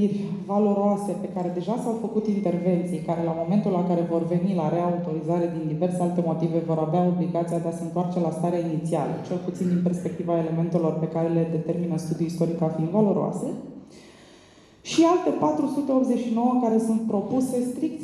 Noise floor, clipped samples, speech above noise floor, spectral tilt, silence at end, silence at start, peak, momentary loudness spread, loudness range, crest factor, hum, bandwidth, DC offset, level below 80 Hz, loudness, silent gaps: -52 dBFS; under 0.1%; 28 dB; -8 dB/octave; 0 s; 0 s; -8 dBFS; 6 LU; 3 LU; 16 dB; none; 12.5 kHz; under 0.1%; -64 dBFS; -25 LUFS; none